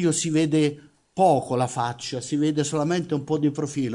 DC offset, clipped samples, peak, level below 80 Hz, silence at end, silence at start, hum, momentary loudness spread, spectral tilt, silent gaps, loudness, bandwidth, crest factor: under 0.1%; under 0.1%; -6 dBFS; -64 dBFS; 0 s; 0 s; none; 7 LU; -5.5 dB/octave; none; -24 LUFS; 11 kHz; 16 dB